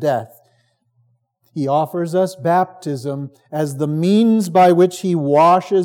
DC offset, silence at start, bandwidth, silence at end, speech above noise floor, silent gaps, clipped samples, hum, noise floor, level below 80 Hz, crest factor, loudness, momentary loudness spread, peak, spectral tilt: under 0.1%; 0 s; 17.5 kHz; 0 s; 46 dB; none; under 0.1%; none; -62 dBFS; -80 dBFS; 14 dB; -16 LUFS; 13 LU; -2 dBFS; -7 dB/octave